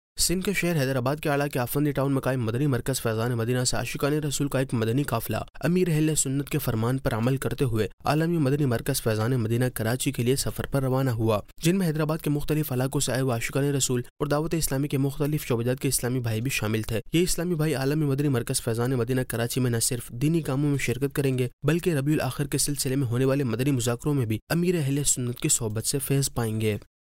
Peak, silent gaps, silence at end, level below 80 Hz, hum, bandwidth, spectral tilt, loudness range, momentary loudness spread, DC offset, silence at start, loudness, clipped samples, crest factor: -12 dBFS; 7.93-7.98 s, 14.10-14.16 s, 21.53-21.59 s, 24.42-24.47 s; 0.35 s; -44 dBFS; none; 16 kHz; -5 dB/octave; 1 LU; 3 LU; under 0.1%; 0.15 s; -26 LUFS; under 0.1%; 14 dB